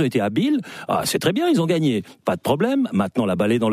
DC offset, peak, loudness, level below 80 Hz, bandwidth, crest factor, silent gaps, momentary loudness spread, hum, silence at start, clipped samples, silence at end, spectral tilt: under 0.1%; -8 dBFS; -21 LUFS; -58 dBFS; 15.5 kHz; 12 dB; none; 6 LU; none; 0 s; under 0.1%; 0 s; -5.5 dB/octave